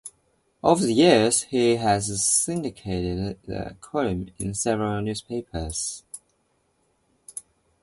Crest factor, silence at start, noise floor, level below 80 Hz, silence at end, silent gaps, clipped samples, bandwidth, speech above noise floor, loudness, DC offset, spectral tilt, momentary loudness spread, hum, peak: 22 dB; 0.05 s; -69 dBFS; -46 dBFS; 0.45 s; none; under 0.1%; 12 kHz; 45 dB; -23 LUFS; under 0.1%; -4 dB/octave; 21 LU; none; -2 dBFS